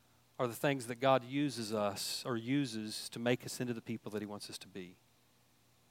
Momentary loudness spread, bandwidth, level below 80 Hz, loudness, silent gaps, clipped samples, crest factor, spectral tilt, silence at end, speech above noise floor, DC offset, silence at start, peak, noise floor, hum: 14 LU; 16.5 kHz; -82 dBFS; -37 LUFS; none; under 0.1%; 22 dB; -4.5 dB/octave; 0.95 s; 33 dB; under 0.1%; 0.4 s; -16 dBFS; -70 dBFS; 60 Hz at -60 dBFS